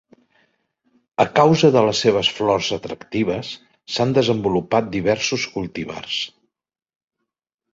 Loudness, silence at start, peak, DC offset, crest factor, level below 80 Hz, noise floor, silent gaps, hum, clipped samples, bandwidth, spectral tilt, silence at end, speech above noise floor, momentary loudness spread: -19 LUFS; 1.2 s; -2 dBFS; under 0.1%; 20 dB; -52 dBFS; -84 dBFS; none; none; under 0.1%; 8 kHz; -5 dB/octave; 1.45 s; 65 dB; 14 LU